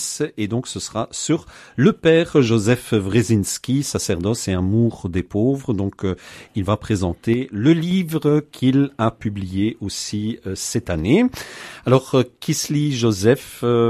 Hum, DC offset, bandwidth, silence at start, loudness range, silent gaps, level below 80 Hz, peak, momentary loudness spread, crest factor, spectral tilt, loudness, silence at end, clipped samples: none; under 0.1%; 14 kHz; 0 s; 3 LU; none; -42 dBFS; -2 dBFS; 9 LU; 18 dB; -5.5 dB/octave; -20 LUFS; 0 s; under 0.1%